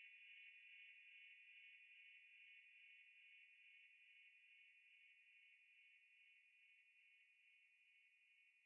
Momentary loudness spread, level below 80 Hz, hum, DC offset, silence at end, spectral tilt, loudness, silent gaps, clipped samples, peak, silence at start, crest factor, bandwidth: 7 LU; under -90 dBFS; none; under 0.1%; 0 s; 7 dB/octave; -65 LUFS; none; under 0.1%; -54 dBFS; 0 s; 16 dB; 3.5 kHz